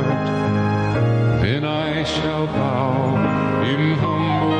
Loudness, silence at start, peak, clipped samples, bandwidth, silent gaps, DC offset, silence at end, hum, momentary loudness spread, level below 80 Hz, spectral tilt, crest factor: -20 LUFS; 0 s; -8 dBFS; under 0.1%; 9 kHz; none; under 0.1%; 0 s; none; 3 LU; -44 dBFS; -7.5 dB/octave; 12 dB